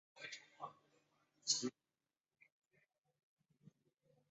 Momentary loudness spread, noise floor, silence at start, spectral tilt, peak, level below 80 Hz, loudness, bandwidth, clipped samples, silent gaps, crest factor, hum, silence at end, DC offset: 17 LU; under -90 dBFS; 0.15 s; -1 dB/octave; -22 dBFS; under -90 dBFS; -43 LUFS; 7.6 kHz; under 0.1%; 2.52-2.62 s, 2.98-3.02 s, 3.23-3.37 s; 30 dB; none; 0.6 s; under 0.1%